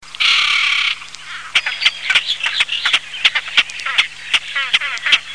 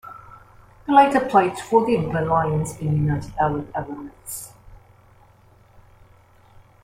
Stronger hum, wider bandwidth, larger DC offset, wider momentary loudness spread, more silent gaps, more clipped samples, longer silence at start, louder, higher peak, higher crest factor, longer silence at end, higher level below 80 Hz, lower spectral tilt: neither; second, 11 kHz vs 16 kHz; first, 0.8% vs under 0.1%; second, 5 LU vs 19 LU; neither; neither; about the same, 0 s vs 0.05 s; first, -15 LUFS vs -21 LUFS; about the same, 0 dBFS vs -2 dBFS; about the same, 16 dB vs 20 dB; second, 0 s vs 2.05 s; second, -56 dBFS vs -48 dBFS; second, 2.5 dB/octave vs -6.5 dB/octave